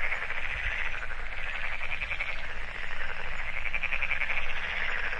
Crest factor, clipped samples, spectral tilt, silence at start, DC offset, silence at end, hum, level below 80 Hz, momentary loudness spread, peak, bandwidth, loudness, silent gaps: 14 dB; under 0.1%; -3 dB/octave; 0 s; under 0.1%; 0 s; none; -36 dBFS; 7 LU; -14 dBFS; 7.2 kHz; -32 LUFS; none